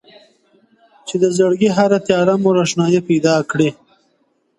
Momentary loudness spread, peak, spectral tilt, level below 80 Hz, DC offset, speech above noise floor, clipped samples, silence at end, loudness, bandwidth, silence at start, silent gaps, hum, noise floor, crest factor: 5 LU; 0 dBFS; -5.5 dB/octave; -58 dBFS; under 0.1%; 48 dB; under 0.1%; 0.85 s; -15 LUFS; 11.5 kHz; 1.05 s; none; none; -63 dBFS; 16 dB